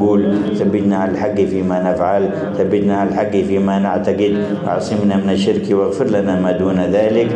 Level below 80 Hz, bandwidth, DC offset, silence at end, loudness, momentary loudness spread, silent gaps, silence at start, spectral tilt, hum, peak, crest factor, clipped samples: -54 dBFS; 9 kHz; under 0.1%; 0 s; -16 LUFS; 2 LU; none; 0 s; -7.5 dB/octave; none; -4 dBFS; 10 dB; under 0.1%